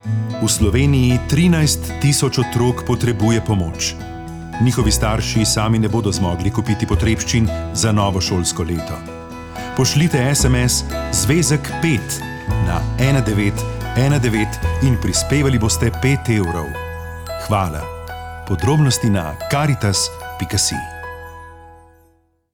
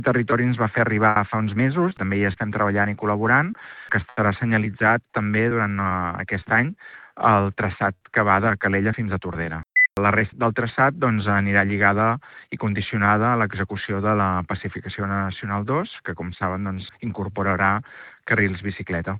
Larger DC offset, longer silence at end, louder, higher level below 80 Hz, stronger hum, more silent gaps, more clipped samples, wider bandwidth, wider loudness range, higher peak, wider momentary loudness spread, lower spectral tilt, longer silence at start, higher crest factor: neither; first, 0.8 s vs 0 s; first, -17 LUFS vs -22 LUFS; first, -30 dBFS vs -54 dBFS; neither; neither; neither; first, 20 kHz vs 4.8 kHz; about the same, 3 LU vs 5 LU; about the same, -2 dBFS vs -2 dBFS; first, 14 LU vs 11 LU; second, -5 dB/octave vs -9.5 dB/octave; about the same, 0.05 s vs 0 s; second, 14 dB vs 20 dB